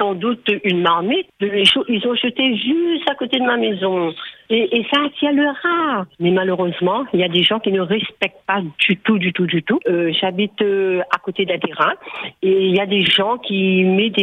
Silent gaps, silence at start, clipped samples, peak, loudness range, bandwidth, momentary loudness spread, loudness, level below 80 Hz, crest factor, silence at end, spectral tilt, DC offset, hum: none; 0 s; under 0.1%; 0 dBFS; 1 LU; 10 kHz; 6 LU; -17 LUFS; -62 dBFS; 16 dB; 0 s; -6 dB/octave; under 0.1%; none